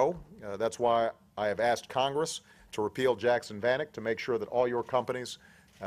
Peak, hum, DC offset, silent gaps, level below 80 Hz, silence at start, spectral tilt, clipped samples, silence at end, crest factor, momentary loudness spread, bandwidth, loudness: -14 dBFS; none; under 0.1%; none; -64 dBFS; 0 s; -4 dB/octave; under 0.1%; 0 s; 18 dB; 12 LU; 15 kHz; -31 LUFS